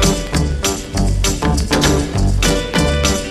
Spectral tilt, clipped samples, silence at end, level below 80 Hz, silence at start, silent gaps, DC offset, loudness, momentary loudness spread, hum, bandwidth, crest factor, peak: -4 dB/octave; under 0.1%; 0 s; -20 dBFS; 0 s; none; under 0.1%; -16 LUFS; 4 LU; none; 15.5 kHz; 16 dB; 0 dBFS